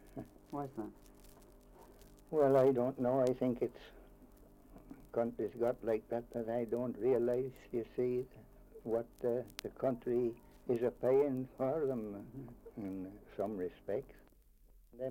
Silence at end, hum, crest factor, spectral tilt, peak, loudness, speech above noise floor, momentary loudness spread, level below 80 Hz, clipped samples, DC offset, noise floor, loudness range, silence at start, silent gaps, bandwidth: 0 s; none; 18 dB; -8 dB/octave; -18 dBFS; -37 LUFS; 28 dB; 17 LU; -64 dBFS; under 0.1%; under 0.1%; -64 dBFS; 5 LU; 0.05 s; none; 16.5 kHz